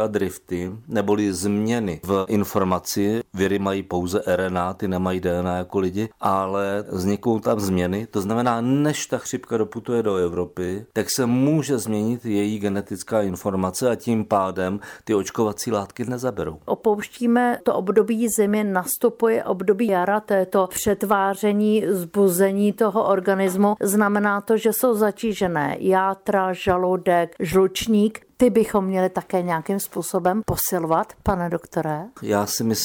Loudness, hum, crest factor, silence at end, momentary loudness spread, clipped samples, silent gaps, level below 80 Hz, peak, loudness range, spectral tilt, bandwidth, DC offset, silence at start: -22 LUFS; none; 16 dB; 0 s; 6 LU; under 0.1%; none; -50 dBFS; -6 dBFS; 4 LU; -5.5 dB/octave; over 20 kHz; under 0.1%; 0 s